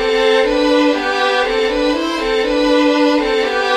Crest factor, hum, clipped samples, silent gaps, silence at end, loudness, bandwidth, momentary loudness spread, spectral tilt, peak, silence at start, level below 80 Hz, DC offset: 12 dB; none; under 0.1%; none; 0 s; -14 LUFS; 12 kHz; 4 LU; -3 dB/octave; -2 dBFS; 0 s; -40 dBFS; under 0.1%